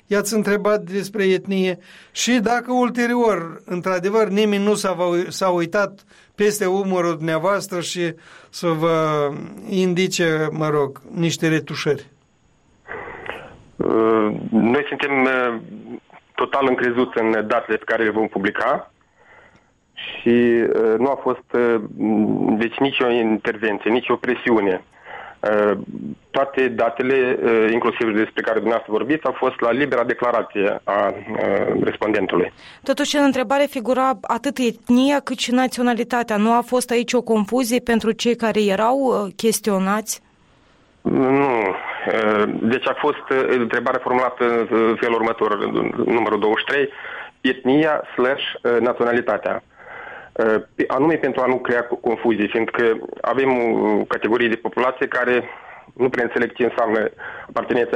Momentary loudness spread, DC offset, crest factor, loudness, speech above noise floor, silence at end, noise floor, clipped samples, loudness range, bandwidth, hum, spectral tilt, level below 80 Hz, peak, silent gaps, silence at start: 8 LU; under 0.1%; 12 dB; -20 LUFS; 40 dB; 0 s; -59 dBFS; under 0.1%; 2 LU; 16 kHz; none; -5 dB/octave; -58 dBFS; -8 dBFS; none; 0.1 s